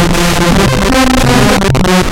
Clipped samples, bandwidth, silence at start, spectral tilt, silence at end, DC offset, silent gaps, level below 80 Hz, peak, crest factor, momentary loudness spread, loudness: 0.1%; 17.5 kHz; 0 s; -4.5 dB/octave; 0 s; under 0.1%; none; -18 dBFS; 0 dBFS; 8 dB; 2 LU; -9 LUFS